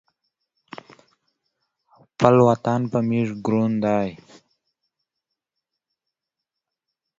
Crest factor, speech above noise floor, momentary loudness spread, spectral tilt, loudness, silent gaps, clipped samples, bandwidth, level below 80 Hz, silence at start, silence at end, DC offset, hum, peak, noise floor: 24 dB; 65 dB; 26 LU; -8 dB/octave; -20 LUFS; none; under 0.1%; 7.6 kHz; -58 dBFS; 2.2 s; 3.05 s; under 0.1%; none; 0 dBFS; -85 dBFS